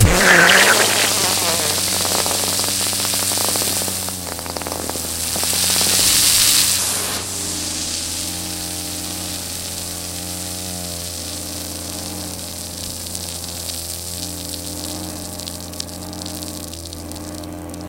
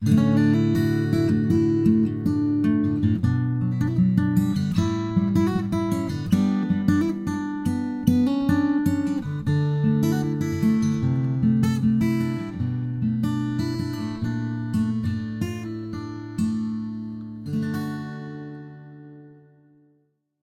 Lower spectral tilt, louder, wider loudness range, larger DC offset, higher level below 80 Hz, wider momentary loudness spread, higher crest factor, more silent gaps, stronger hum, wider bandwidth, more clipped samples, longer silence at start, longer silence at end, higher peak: second, -1.5 dB/octave vs -8 dB/octave; first, -18 LUFS vs -23 LUFS; first, 11 LU vs 8 LU; neither; first, -38 dBFS vs -52 dBFS; first, 17 LU vs 11 LU; about the same, 20 dB vs 18 dB; neither; neither; first, 17 kHz vs 14.5 kHz; neither; about the same, 0 s vs 0 s; second, 0 s vs 1.1 s; first, 0 dBFS vs -4 dBFS